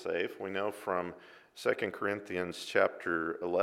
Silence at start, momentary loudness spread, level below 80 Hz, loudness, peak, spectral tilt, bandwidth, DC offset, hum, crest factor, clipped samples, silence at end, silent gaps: 0 s; 7 LU; -74 dBFS; -34 LUFS; -12 dBFS; -4.5 dB/octave; 16 kHz; under 0.1%; none; 22 dB; under 0.1%; 0 s; none